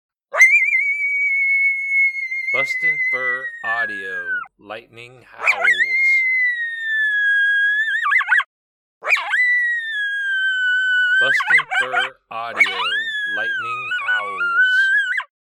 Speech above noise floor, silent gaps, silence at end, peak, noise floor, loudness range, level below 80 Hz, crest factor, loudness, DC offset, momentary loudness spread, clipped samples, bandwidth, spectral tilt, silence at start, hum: over 70 dB; 8.46-9.01 s; 0.15 s; -4 dBFS; under -90 dBFS; 4 LU; -70 dBFS; 16 dB; -17 LUFS; under 0.1%; 10 LU; under 0.1%; 16 kHz; 0 dB/octave; 0.3 s; none